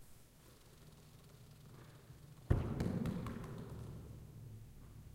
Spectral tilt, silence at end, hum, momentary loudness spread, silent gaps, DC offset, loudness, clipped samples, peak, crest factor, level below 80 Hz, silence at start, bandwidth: -7.5 dB/octave; 0 s; none; 22 LU; none; under 0.1%; -43 LUFS; under 0.1%; -18 dBFS; 28 dB; -52 dBFS; 0 s; 16 kHz